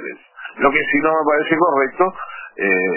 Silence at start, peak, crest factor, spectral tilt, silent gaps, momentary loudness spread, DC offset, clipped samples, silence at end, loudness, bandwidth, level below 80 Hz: 0 s; -2 dBFS; 16 dB; -9 dB/octave; none; 16 LU; under 0.1%; under 0.1%; 0 s; -17 LUFS; 3.1 kHz; -52 dBFS